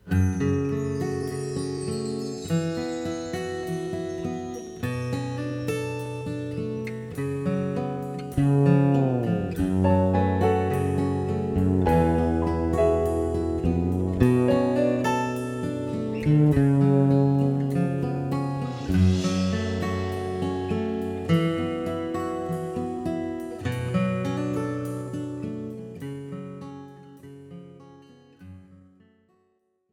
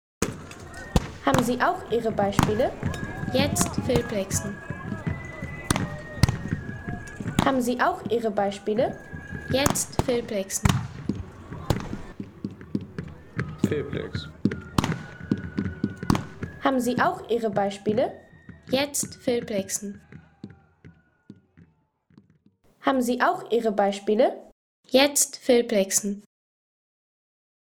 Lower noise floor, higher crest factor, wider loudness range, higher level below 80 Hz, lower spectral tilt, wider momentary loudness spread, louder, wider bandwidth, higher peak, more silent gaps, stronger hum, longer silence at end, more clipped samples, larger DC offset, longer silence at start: first, -70 dBFS vs -64 dBFS; about the same, 22 dB vs 22 dB; about the same, 8 LU vs 7 LU; about the same, -44 dBFS vs -44 dBFS; first, -7.5 dB/octave vs -4.5 dB/octave; second, 12 LU vs 15 LU; about the same, -25 LUFS vs -26 LUFS; second, 14.5 kHz vs over 20 kHz; about the same, -4 dBFS vs -4 dBFS; second, none vs 24.52-24.83 s; neither; second, 1.2 s vs 1.6 s; neither; neither; second, 0.05 s vs 0.2 s